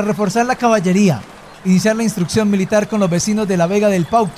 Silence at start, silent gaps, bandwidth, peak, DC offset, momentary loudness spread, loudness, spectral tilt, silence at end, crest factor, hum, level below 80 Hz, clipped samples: 0 s; none; 15 kHz; -2 dBFS; under 0.1%; 3 LU; -15 LUFS; -5.5 dB/octave; 0 s; 12 dB; none; -48 dBFS; under 0.1%